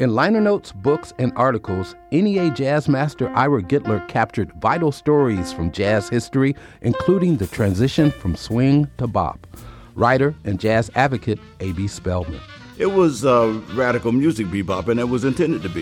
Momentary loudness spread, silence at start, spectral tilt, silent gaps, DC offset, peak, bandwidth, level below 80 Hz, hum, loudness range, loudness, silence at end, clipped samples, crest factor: 9 LU; 0 s; -7 dB/octave; none; under 0.1%; -2 dBFS; 16.5 kHz; -46 dBFS; none; 2 LU; -20 LUFS; 0 s; under 0.1%; 16 dB